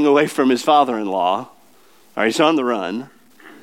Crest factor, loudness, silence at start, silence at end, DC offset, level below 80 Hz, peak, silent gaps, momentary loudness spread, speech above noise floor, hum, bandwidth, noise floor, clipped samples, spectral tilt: 18 dB; -18 LUFS; 0 s; 0.1 s; 0.2%; -78 dBFS; -2 dBFS; none; 11 LU; 36 dB; none; 16.5 kHz; -53 dBFS; under 0.1%; -4.5 dB/octave